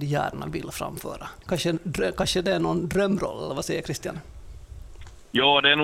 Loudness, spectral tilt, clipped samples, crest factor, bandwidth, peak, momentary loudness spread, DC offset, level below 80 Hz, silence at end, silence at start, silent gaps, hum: -25 LUFS; -4 dB/octave; under 0.1%; 20 dB; 16 kHz; -6 dBFS; 20 LU; under 0.1%; -46 dBFS; 0 s; 0 s; none; none